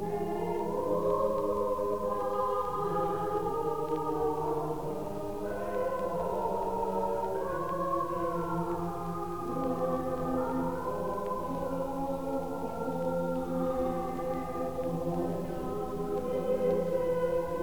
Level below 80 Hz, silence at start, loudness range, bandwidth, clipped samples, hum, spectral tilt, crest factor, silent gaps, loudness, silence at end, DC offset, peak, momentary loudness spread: -52 dBFS; 0 s; 2 LU; over 20 kHz; under 0.1%; none; -7.5 dB/octave; 14 dB; none; -33 LUFS; 0 s; 0.6%; -16 dBFS; 5 LU